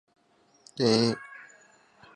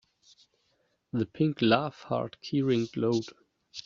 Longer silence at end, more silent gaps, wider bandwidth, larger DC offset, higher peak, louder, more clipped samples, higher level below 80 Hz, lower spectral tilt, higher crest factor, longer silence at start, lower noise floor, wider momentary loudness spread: first, 0.75 s vs 0.05 s; neither; first, 10.5 kHz vs 7.6 kHz; neither; about the same, -10 dBFS vs -8 dBFS; first, -26 LUFS vs -29 LUFS; neither; second, -74 dBFS vs -68 dBFS; second, -5 dB/octave vs -6.5 dB/octave; about the same, 22 dB vs 22 dB; second, 0.75 s vs 1.15 s; second, -65 dBFS vs -73 dBFS; first, 23 LU vs 10 LU